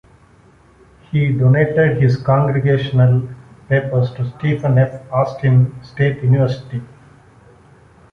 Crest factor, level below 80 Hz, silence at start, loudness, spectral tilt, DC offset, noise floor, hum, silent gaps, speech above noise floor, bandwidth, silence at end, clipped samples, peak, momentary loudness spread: 14 dB; -46 dBFS; 1.15 s; -16 LUFS; -9.5 dB/octave; under 0.1%; -49 dBFS; none; none; 34 dB; 5.2 kHz; 1.25 s; under 0.1%; -2 dBFS; 8 LU